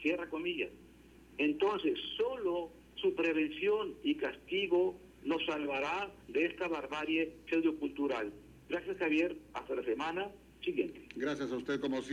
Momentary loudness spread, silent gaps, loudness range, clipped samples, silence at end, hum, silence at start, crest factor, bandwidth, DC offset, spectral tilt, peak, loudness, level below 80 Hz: 8 LU; none; 2 LU; under 0.1%; 0 s; none; 0 s; 16 dB; 16 kHz; under 0.1%; -5 dB/octave; -20 dBFS; -35 LUFS; -66 dBFS